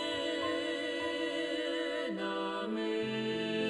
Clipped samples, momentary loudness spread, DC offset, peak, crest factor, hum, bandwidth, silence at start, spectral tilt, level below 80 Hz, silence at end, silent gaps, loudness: under 0.1%; 2 LU; under 0.1%; -22 dBFS; 14 dB; none; 11.5 kHz; 0 s; -4.5 dB/octave; -72 dBFS; 0 s; none; -35 LUFS